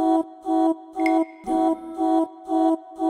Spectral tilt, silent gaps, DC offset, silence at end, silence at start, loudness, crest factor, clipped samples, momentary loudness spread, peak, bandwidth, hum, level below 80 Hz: -5.5 dB/octave; none; under 0.1%; 0 s; 0 s; -23 LUFS; 14 dB; under 0.1%; 3 LU; -10 dBFS; 10.5 kHz; none; -60 dBFS